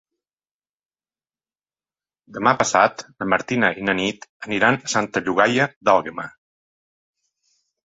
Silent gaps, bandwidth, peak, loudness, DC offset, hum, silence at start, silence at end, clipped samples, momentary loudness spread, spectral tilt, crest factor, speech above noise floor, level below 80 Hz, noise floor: 4.29-4.40 s, 5.76-5.81 s; 8 kHz; -2 dBFS; -20 LUFS; under 0.1%; none; 2.3 s; 1.65 s; under 0.1%; 14 LU; -4 dB/octave; 22 dB; over 70 dB; -60 dBFS; under -90 dBFS